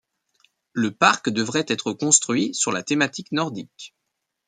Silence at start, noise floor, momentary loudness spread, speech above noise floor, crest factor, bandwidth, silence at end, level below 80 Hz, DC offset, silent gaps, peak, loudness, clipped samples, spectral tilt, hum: 0.75 s; -79 dBFS; 17 LU; 57 dB; 22 dB; 10 kHz; 0.6 s; -68 dBFS; under 0.1%; none; 0 dBFS; -21 LUFS; under 0.1%; -2.5 dB/octave; none